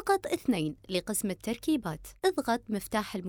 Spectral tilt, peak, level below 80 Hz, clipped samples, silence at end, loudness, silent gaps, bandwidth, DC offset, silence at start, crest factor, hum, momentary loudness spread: -4.5 dB/octave; -14 dBFS; -56 dBFS; under 0.1%; 0 s; -31 LUFS; none; over 20 kHz; under 0.1%; 0 s; 18 dB; none; 5 LU